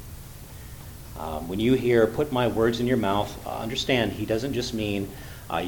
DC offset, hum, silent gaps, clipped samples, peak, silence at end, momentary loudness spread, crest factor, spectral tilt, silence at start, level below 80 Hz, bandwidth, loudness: under 0.1%; none; none; under 0.1%; -6 dBFS; 0 s; 20 LU; 20 dB; -5.5 dB/octave; 0 s; -44 dBFS; 19 kHz; -25 LUFS